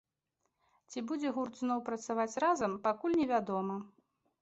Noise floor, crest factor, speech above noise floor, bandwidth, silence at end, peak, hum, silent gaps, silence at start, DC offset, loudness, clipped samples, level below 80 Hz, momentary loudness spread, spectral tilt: -84 dBFS; 16 dB; 50 dB; 8 kHz; 0.55 s; -18 dBFS; none; none; 0.9 s; under 0.1%; -34 LUFS; under 0.1%; -74 dBFS; 9 LU; -5 dB/octave